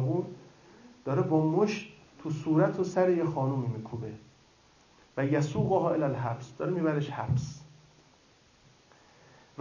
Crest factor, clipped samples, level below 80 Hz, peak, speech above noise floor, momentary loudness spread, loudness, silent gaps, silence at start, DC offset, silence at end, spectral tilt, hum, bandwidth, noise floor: 20 dB; under 0.1%; -60 dBFS; -12 dBFS; 33 dB; 16 LU; -30 LUFS; none; 0 s; under 0.1%; 1.95 s; -8 dB/octave; none; 7.4 kHz; -62 dBFS